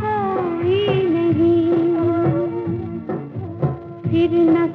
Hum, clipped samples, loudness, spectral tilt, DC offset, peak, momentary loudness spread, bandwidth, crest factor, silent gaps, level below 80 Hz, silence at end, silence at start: none; under 0.1%; -19 LUFS; -10 dB/octave; under 0.1%; -6 dBFS; 11 LU; 4.3 kHz; 12 dB; none; -50 dBFS; 0 s; 0 s